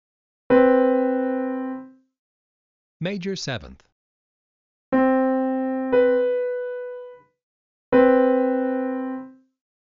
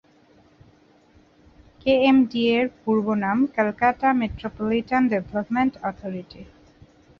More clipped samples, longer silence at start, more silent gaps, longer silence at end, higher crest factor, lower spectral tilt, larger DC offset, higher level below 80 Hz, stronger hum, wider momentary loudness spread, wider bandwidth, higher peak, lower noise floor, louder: neither; second, 0.5 s vs 1.85 s; first, 2.19-3.00 s, 3.92-4.92 s, 7.43-7.92 s vs none; second, 0.6 s vs 0.75 s; about the same, 18 dB vs 16 dB; second, -5 dB/octave vs -7.5 dB/octave; neither; second, -58 dBFS vs -52 dBFS; neither; first, 16 LU vs 12 LU; first, 7.4 kHz vs 6.4 kHz; about the same, -4 dBFS vs -6 dBFS; second, -41 dBFS vs -56 dBFS; about the same, -21 LUFS vs -22 LUFS